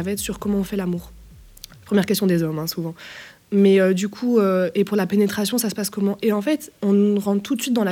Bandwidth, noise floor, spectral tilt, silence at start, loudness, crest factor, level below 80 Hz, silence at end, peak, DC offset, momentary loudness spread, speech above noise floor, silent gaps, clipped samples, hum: 17 kHz; -43 dBFS; -5.5 dB/octave; 0 s; -21 LUFS; 16 dB; -50 dBFS; 0 s; -4 dBFS; under 0.1%; 10 LU; 23 dB; none; under 0.1%; none